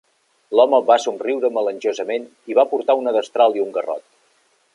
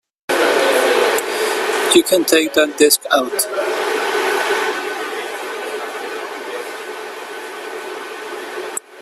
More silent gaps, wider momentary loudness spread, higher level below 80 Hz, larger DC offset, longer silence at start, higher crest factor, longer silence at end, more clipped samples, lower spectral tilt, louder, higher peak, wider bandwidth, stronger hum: neither; second, 10 LU vs 15 LU; second, -76 dBFS vs -64 dBFS; neither; first, 0.5 s vs 0.3 s; about the same, 18 dB vs 18 dB; first, 0.75 s vs 0 s; neither; first, -3 dB/octave vs -1 dB/octave; about the same, -19 LUFS vs -17 LUFS; about the same, -2 dBFS vs 0 dBFS; second, 11 kHz vs 16 kHz; neither